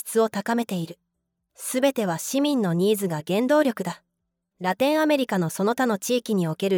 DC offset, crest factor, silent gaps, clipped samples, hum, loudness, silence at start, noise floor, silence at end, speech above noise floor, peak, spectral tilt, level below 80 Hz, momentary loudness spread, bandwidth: under 0.1%; 16 dB; none; under 0.1%; none; -24 LUFS; 0.05 s; -79 dBFS; 0 s; 56 dB; -8 dBFS; -5 dB/octave; -76 dBFS; 9 LU; over 20 kHz